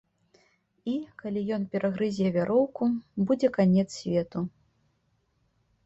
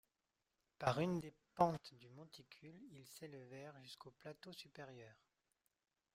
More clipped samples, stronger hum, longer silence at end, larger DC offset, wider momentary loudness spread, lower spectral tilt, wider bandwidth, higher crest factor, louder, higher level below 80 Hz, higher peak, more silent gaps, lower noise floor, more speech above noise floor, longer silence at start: neither; neither; first, 1.35 s vs 1 s; neither; second, 11 LU vs 21 LU; first, -7.5 dB/octave vs -6 dB/octave; second, 8 kHz vs 16 kHz; second, 18 dB vs 26 dB; first, -28 LUFS vs -44 LUFS; first, -64 dBFS vs -78 dBFS; first, -10 dBFS vs -20 dBFS; neither; second, -72 dBFS vs -90 dBFS; about the same, 45 dB vs 44 dB; about the same, 0.85 s vs 0.8 s